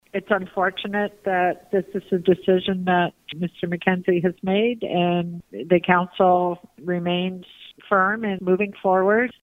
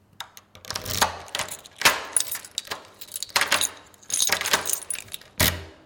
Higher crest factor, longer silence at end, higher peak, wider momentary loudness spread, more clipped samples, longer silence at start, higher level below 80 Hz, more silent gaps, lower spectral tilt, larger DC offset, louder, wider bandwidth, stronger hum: about the same, 20 dB vs 22 dB; about the same, 0.1 s vs 0.1 s; first, -2 dBFS vs -6 dBFS; second, 9 LU vs 15 LU; neither; about the same, 0.15 s vs 0.2 s; second, -60 dBFS vs -48 dBFS; neither; first, -8 dB/octave vs -0.5 dB/octave; neither; about the same, -22 LUFS vs -24 LUFS; second, 4 kHz vs 17 kHz; neither